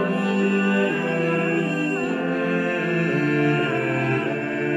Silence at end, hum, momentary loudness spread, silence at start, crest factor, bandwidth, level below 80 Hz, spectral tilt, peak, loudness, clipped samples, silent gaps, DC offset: 0 s; none; 3 LU; 0 s; 12 dB; 12 kHz; -66 dBFS; -7 dB/octave; -8 dBFS; -22 LUFS; under 0.1%; none; under 0.1%